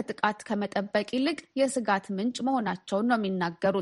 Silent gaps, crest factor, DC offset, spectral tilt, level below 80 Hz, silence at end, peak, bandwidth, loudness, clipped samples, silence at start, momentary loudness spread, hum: none; 20 dB; under 0.1%; -5 dB/octave; -70 dBFS; 0 s; -8 dBFS; 11.5 kHz; -28 LUFS; under 0.1%; 0 s; 4 LU; none